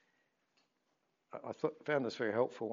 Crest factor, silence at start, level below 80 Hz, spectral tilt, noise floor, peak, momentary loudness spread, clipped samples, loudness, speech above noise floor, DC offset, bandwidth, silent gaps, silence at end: 20 dB; 1.35 s; under -90 dBFS; -4.5 dB/octave; -81 dBFS; -20 dBFS; 13 LU; under 0.1%; -37 LUFS; 45 dB; under 0.1%; 7.4 kHz; none; 0 s